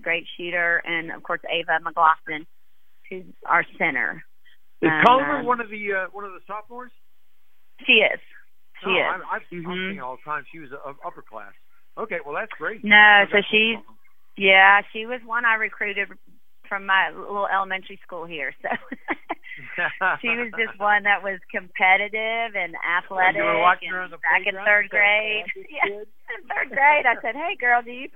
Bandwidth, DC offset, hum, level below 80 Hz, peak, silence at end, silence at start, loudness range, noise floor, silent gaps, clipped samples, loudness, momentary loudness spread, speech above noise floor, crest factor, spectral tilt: 16 kHz; 0.8%; none; -68 dBFS; 0 dBFS; 0.1 s; 0.05 s; 10 LU; -70 dBFS; none; under 0.1%; -20 LUFS; 19 LU; 48 dB; 22 dB; -5.5 dB/octave